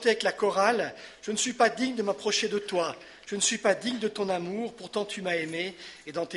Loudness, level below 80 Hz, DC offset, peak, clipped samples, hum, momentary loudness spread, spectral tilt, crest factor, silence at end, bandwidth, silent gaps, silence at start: -28 LUFS; -70 dBFS; under 0.1%; -8 dBFS; under 0.1%; none; 11 LU; -2.5 dB/octave; 20 dB; 0 s; 11.5 kHz; none; 0 s